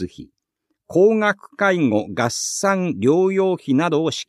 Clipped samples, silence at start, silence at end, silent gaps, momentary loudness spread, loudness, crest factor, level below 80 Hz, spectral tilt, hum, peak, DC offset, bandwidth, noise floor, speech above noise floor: under 0.1%; 0 s; 0.05 s; none; 5 LU; -19 LUFS; 16 dB; -60 dBFS; -5 dB/octave; none; -4 dBFS; under 0.1%; 13.5 kHz; -75 dBFS; 56 dB